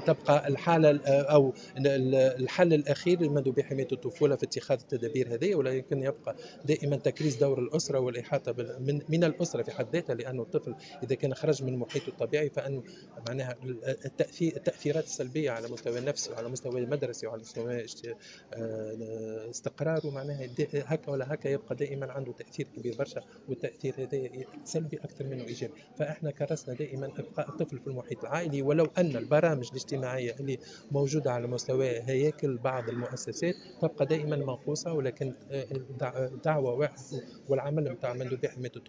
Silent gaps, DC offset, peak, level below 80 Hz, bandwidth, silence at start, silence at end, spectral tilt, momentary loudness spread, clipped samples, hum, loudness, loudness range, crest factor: none; under 0.1%; -10 dBFS; -70 dBFS; 8 kHz; 0 s; 0.1 s; -6 dB/octave; 12 LU; under 0.1%; none; -31 LUFS; 9 LU; 22 dB